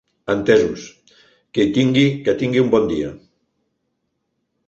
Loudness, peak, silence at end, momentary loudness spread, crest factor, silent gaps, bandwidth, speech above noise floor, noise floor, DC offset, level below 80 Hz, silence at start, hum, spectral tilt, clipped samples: -18 LUFS; -2 dBFS; 1.5 s; 10 LU; 18 dB; none; 8 kHz; 56 dB; -73 dBFS; under 0.1%; -50 dBFS; 0.3 s; none; -6.5 dB/octave; under 0.1%